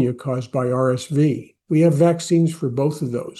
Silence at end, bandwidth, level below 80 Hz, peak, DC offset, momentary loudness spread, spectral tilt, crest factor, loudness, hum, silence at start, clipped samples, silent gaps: 0 s; 12.5 kHz; -64 dBFS; -4 dBFS; under 0.1%; 8 LU; -7.5 dB/octave; 16 dB; -20 LUFS; none; 0 s; under 0.1%; none